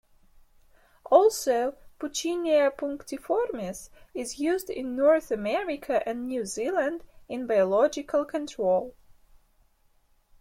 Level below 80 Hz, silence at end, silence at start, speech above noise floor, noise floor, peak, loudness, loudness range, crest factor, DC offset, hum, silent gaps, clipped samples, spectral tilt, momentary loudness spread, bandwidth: -60 dBFS; 1.5 s; 1.05 s; 38 dB; -64 dBFS; -4 dBFS; -27 LUFS; 3 LU; 22 dB; under 0.1%; none; none; under 0.1%; -4 dB/octave; 14 LU; 16.5 kHz